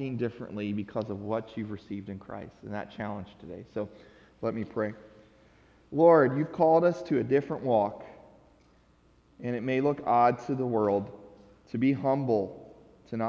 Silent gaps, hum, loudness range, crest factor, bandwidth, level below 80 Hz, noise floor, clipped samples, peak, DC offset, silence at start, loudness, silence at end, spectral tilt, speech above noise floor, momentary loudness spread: none; none; 12 LU; 20 dB; 7 kHz; -62 dBFS; -62 dBFS; under 0.1%; -8 dBFS; under 0.1%; 0 s; -28 LUFS; 0 s; -9 dB/octave; 34 dB; 18 LU